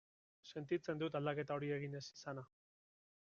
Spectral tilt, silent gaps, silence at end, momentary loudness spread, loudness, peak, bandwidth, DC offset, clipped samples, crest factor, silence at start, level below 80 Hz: -5.5 dB/octave; none; 0.8 s; 12 LU; -44 LUFS; -26 dBFS; 7.2 kHz; under 0.1%; under 0.1%; 18 dB; 0.45 s; -82 dBFS